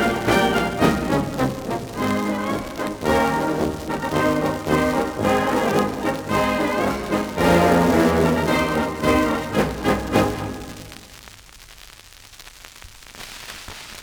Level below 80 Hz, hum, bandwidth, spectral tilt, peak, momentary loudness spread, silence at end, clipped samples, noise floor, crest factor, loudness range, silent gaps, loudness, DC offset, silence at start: -40 dBFS; none; over 20 kHz; -5.5 dB/octave; -4 dBFS; 20 LU; 0 s; under 0.1%; -45 dBFS; 18 dB; 9 LU; none; -21 LUFS; under 0.1%; 0 s